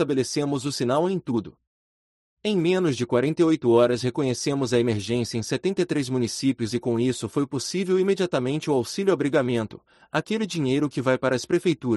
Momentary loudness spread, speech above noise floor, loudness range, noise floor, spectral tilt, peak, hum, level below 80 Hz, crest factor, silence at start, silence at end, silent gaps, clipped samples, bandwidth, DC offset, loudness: 6 LU; over 67 dB; 2 LU; under -90 dBFS; -5.5 dB/octave; -6 dBFS; none; -62 dBFS; 16 dB; 0 s; 0 s; 1.67-2.37 s; under 0.1%; 12 kHz; under 0.1%; -24 LUFS